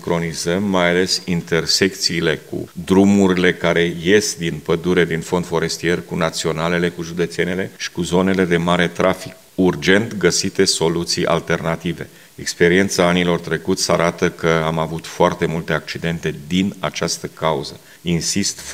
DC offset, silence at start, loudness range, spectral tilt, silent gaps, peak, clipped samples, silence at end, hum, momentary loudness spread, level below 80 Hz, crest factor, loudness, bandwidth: 0.2%; 0 s; 4 LU; -4.5 dB/octave; none; 0 dBFS; under 0.1%; 0 s; none; 9 LU; -50 dBFS; 18 dB; -18 LUFS; 16 kHz